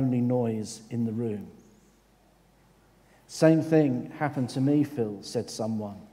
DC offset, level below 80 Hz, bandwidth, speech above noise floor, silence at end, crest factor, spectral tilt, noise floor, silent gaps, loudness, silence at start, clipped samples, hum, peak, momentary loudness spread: under 0.1%; -68 dBFS; 15 kHz; 34 dB; 0.05 s; 22 dB; -7 dB/octave; -61 dBFS; none; -27 LUFS; 0 s; under 0.1%; none; -6 dBFS; 12 LU